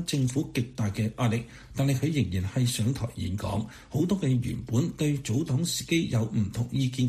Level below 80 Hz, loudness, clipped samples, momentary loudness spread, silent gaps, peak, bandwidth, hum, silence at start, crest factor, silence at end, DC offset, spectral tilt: -50 dBFS; -28 LUFS; under 0.1%; 6 LU; none; -14 dBFS; 15.5 kHz; none; 0 s; 14 dB; 0 s; under 0.1%; -6 dB/octave